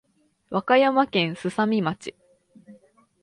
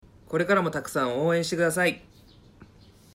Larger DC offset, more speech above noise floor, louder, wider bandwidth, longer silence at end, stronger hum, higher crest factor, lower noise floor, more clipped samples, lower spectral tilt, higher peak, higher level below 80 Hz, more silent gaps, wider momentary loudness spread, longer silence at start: neither; first, 34 dB vs 28 dB; first, -22 LUFS vs -25 LUFS; second, 11.5 kHz vs 16 kHz; about the same, 0.5 s vs 0.5 s; neither; about the same, 20 dB vs 18 dB; about the same, -56 dBFS vs -54 dBFS; neither; about the same, -6 dB/octave vs -5 dB/octave; first, -6 dBFS vs -10 dBFS; second, -68 dBFS vs -60 dBFS; neither; first, 13 LU vs 6 LU; first, 0.5 s vs 0.3 s